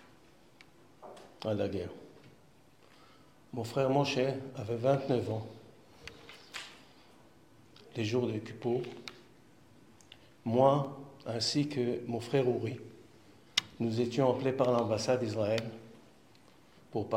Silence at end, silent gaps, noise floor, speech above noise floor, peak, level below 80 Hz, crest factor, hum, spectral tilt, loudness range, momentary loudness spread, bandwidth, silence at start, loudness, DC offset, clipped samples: 0 s; none; -63 dBFS; 31 dB; -10 dBFS; -72 dBFS; 24 dB; none; -5.5 dB/octave; 8 LU; 21 LU; 16 kHz; 1 s; -33 LUFS; under 0.1%; under 0.1%